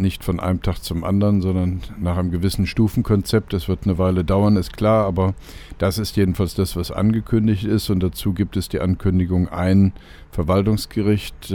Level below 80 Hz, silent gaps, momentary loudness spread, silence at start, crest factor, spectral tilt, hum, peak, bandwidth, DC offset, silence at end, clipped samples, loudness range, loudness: -34 dBFS; none; 6 LU; 0 s; 16 dB; -7 dB/octave; none; -2 dBFS; 18.5 kHz; under 0.1%; 0 s; under 0.1%; 1 LU; -20 LUFS